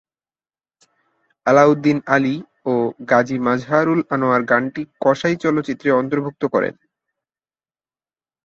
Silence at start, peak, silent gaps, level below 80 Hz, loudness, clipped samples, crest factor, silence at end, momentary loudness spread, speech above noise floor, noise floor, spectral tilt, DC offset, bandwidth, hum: 1.45 s; -2 dBFS; none; -62 dBFS; -18 LUFS; under 0.1%; 18 dB; 1.75 s; 8 LU; over 73 dB; under -90 dBFS; -7 dB/octave; under 0.1%; 7.6 kHz; none